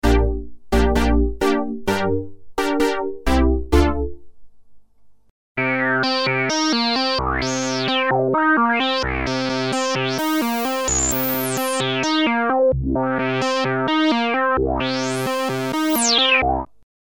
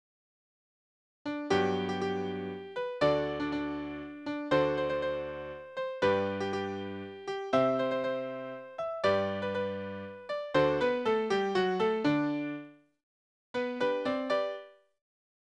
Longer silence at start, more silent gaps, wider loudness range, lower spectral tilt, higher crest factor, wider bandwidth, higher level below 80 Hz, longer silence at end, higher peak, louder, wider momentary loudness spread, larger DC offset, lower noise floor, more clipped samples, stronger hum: second, 0.05 s vs 1.25 s; second, 5.30-5.55 s vs 13.03-13.54 s; about the same, 3 LU vs 3 LU; second, -4 dB/octave vs -6 dB/octave; about the same, 16 dB vs 20 dB; first, over 20 kHz vs 9.8 kHz; first, -28 dBFS vs -64 dBFS; second, 0.4 s vs 0.8 s; first, -4 dBFS vs -12 dBFS; first, -19 LUFS vs -32 LUFS; second, 6 LU vs 11 LU; first, 0.4% vs under 0.1%; second, -50 dBFS vs under -90 dBFS; neither; neither